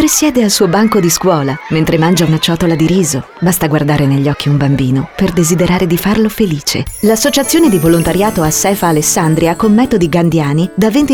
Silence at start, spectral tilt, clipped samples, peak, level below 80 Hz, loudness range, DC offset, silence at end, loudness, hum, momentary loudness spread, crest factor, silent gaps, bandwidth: 0 s; -5 dB/octave; under 0.1%; 0 dBFS; -34 dBFS; 2 LU; 0.1%; 0 s; -11 LUFS; none; 4 LU; 10 dB; none; 19.5 kHz